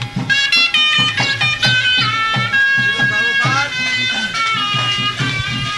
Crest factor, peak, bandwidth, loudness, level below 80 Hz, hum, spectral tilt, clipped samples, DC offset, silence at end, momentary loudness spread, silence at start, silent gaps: 12 dB; -2 dBFS; 12 kHz; -13 LUFS; -46 dBFS; none; -2.5 dB/octave; under 0.1%; under 0.1%; 0 s; 5 LU; 0 s; none